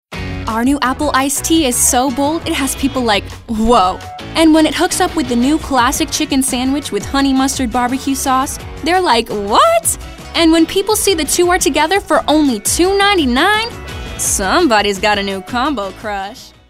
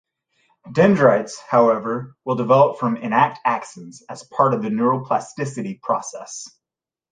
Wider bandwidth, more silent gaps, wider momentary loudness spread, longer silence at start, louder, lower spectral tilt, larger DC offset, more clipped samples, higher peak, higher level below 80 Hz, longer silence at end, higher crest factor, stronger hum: first, 16 kHz vs 9.6 kHz; neither; second, 10 LU vs 18 LU; second, 0.1 s vs 0.65 s; first, -14 LUFS vs -19 LUFS; second, -3 dB/octave vs -6.5 dB/octave; neither; neither; about the same, 0 dBFS vs 0 dBFS; first, -32 dBFS vs -62 dBFS; second, 0.2 s vs 0.65 s; second, 14 dB vs 20 dB; neither